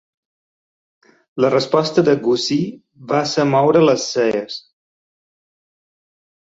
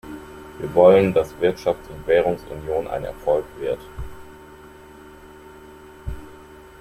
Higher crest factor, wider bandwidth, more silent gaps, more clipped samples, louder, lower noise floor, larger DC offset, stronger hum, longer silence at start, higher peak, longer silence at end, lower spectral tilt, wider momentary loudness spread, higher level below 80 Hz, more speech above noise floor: about the same, 18 dB vs 20 dB; second, 8 kHz vs 15.5 kHz; neither; neither; first, -17 LUFS vs -20 LUFS; first, under -90 dBFS vs -44 dBFS; neither; neither; first, 1.35 s vs 0.05 s; about the same, 0 dBFS vs -2 dBFS; first, 1.9 s vs 0.25 s; second, -5 dB/octave vs -7 dB/octave; second, 13 LU vs 24 LU; second, -62 dBFS vs -44 dBFS; first, over 74 dB vs 24 dB